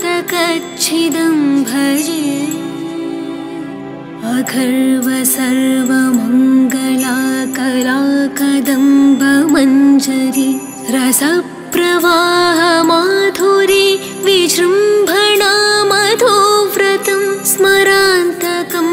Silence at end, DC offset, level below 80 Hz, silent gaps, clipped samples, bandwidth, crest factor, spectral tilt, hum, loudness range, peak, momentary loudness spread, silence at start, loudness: 0 s; under 0.1%; -54 dBFS; none; under 0.1%; 16.5 kHz; 12 dB; -2.5 dB/octave; none; 6 LU; 0 dBFS; 9 LU; 0 s; -12 LUFS